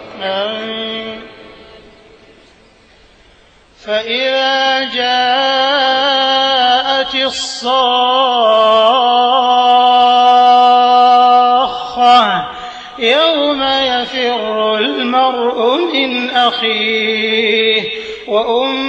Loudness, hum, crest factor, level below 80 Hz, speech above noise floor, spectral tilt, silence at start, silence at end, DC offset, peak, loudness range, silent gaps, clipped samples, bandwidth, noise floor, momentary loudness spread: -12 LUFS; none; 12 dB; -54 dBFS; 33 dB; -2.5 dB/octave; 0 s; 0 s; under 0.1%; 0 dBFS; 11 LU; none; under 0.1%; 8.6 kHz; -46 dBFS; 11 LU